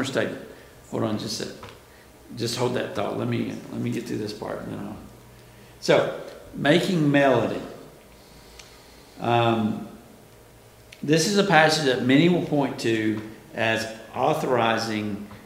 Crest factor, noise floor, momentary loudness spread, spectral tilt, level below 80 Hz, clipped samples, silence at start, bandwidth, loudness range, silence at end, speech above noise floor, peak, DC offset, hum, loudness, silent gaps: 24 dB; -50 dBFS; 18 LU; -5 dB/octave; -58 dBFS; under 0.1%; 0 s; 16 kHz; 8 LU; 0 s; 27 dB; 0 dBFS; under 0.1%; none; -24 LUFS; none